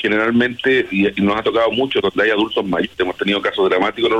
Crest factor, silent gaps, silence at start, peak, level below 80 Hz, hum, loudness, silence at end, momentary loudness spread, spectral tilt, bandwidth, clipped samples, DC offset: 12 dB; none; 0 s; -6 dBFS; -50 dBFS; none; -17 LUFS; 0 s; 4 LU; -6 dB/octave; 11.5 kHz; under 0.1%; under 0.1%